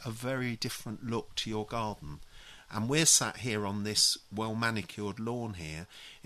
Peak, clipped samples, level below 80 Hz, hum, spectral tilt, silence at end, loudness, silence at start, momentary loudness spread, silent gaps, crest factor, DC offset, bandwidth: -10 dBFS; under 0.1%; -58 dBFS; none; -2.5 dB/octave; 0.05 s; -31 LUFS; 0 s; 17 LU; none; 22 dB; under 0.1%; 13.5 kHz